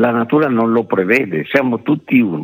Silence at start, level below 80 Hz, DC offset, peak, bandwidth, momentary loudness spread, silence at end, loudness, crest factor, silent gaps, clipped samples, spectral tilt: 0 s; -64 dBFS; under 0.1%; 0 dBFS; 15 kHz; 2 LU; 0 s; -15 LUFS; 14 dB; none; under 0.1%; -8 dB/octave